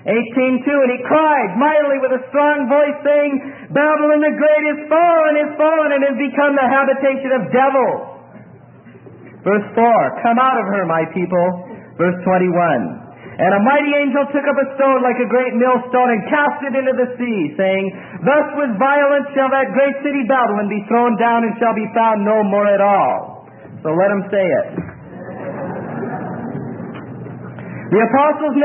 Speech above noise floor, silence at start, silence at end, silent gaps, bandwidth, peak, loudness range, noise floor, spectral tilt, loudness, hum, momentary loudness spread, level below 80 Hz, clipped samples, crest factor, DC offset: 26 dB; 0.05 s; 0 s; none; 3.6 kHz; -2 dBFS; 5 LU; -41 dBFS; -12 dB/octave; -15 LUFS; none; 13 LU; -64 dBFS; under 0.1%; 14 dB; under 0.1%